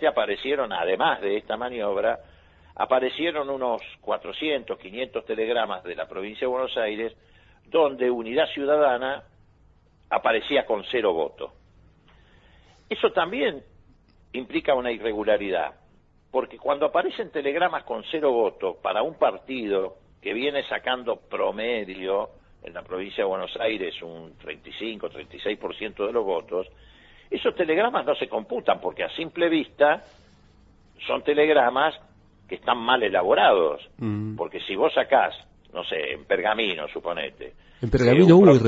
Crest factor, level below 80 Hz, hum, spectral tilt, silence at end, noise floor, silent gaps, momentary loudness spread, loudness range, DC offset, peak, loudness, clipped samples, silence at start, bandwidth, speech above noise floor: 22 dB; -52 dBFS; none; -7 dB/octave; 0 s; -58 dBFS; none; 13 LU; 7 LU; under 0.1%; -2 dBFS; -25 LUFS; under 0.1%; 0 s; 7.8 kHz; 34 dB